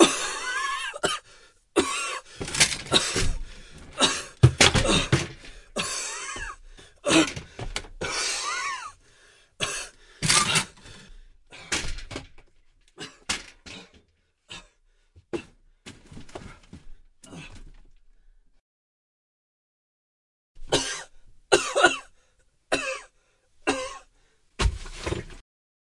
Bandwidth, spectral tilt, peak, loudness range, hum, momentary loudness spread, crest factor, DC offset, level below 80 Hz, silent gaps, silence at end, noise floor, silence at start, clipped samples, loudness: 11.5 kHz; -3 dB/octave; 0 dBFS; 20 LU; none; 24 LU; 28 dB; under 0.1%; -42 dBFS; 18.60-20.55 s; 0.5 s; -67 dBFS; 0 s; under 0.1%; -25 LUFS